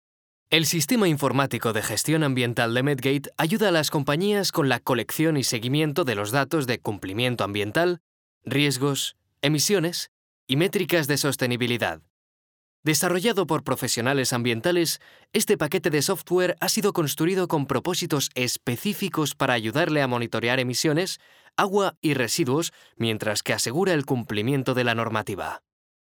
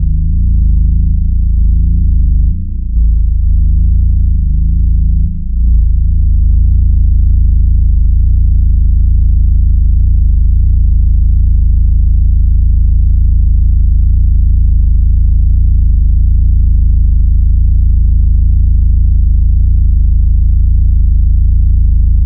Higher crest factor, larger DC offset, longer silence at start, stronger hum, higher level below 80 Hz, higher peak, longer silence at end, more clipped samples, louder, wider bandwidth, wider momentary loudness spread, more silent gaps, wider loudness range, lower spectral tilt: first, 22 dB vs 6 dB; neither; first, 0.5 s vs 0 s; neither; second, -66 dBFS vs -8 dBFS; about the same, -2 dBFS vs 0 dBFS; first, 0.45 s vs 0 s; neither; second, -24 LUFS vs -12 LUFS; first, over 20 kHz vs 0.4 kHz; first, 6 LU vs 2 LU; first, 8.00-8.41 s, 10.08-10.47 s, 12.10-12.83 s, 21.97-22.02 s vs none; about the same, 2 LU vs 1 LU; second, -4 dB/octave vs -19 dB/octave